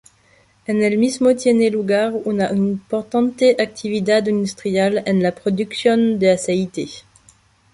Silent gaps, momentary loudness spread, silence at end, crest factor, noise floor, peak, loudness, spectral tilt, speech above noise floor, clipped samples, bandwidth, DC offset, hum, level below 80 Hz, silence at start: none; 7 LU; 0.75 s; 16 dB; -55 dBFS; -2 dBFS; -18 LUFS; -5.5 dB/octave; 38 dB; under 0.1%; 11.5 kHz; under 0.1%; none; -58 dBFS; 0.7 s